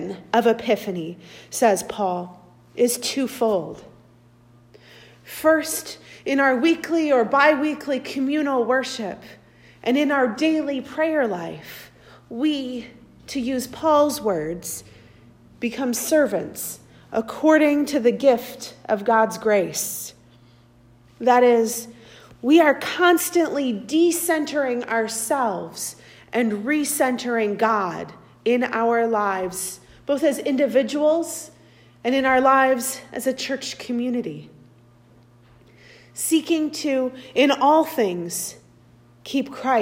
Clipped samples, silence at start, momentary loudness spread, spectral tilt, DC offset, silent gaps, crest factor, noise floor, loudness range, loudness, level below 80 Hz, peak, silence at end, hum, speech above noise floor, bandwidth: under 0.1%; 0 s; 15 LU; -3.5 dB/octave; under 0.1%; none; 18 dB; -53 dBFS; 6 LU; -21 LUFS; -62 dBFS; -4 dBFS; 0 s; 60 Hz at -50 dBFS; 32 dB; 16 kHz